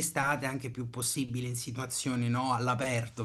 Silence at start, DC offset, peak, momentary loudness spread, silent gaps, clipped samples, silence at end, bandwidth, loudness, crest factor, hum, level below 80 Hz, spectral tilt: 0 s; under 0.1%; -14 dBFS; 6 LU; none; under 0.1%; 0 s; 13 kHz; -32 LUFS; 18 dB; none; -66 dBFS; -4 dB/octave